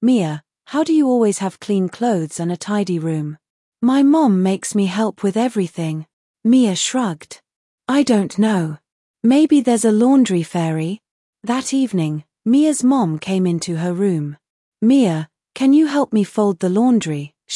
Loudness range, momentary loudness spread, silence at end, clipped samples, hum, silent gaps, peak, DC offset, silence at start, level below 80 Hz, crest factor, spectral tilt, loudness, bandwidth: 3 LU; 11 LU; 0 s; under 0.1%; none; 3.50-3.72 s, 6.13-6.34 s, 7.56-7.78 s, 8.92-9.14 s, 11.11-11.33 s, 14.50-14.72 s; -4 dBFS; under 0.1%; 0 s; -68 dBFS; 12 dB; -6 dB/octave; -17 LUFS; 12 kHz